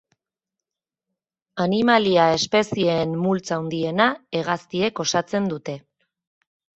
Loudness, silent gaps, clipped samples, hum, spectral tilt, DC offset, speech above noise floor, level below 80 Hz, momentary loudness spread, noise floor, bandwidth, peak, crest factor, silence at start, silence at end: -21 LUFS; none; under 0.1%; none; -4.5 dB/octave; under 0.1%; 67 dB; -60 dBFS; 9 LU; -88 dBFS; 8.2 kHz; -2 dBFS; 20 dB; 1.55 s; 0.95 s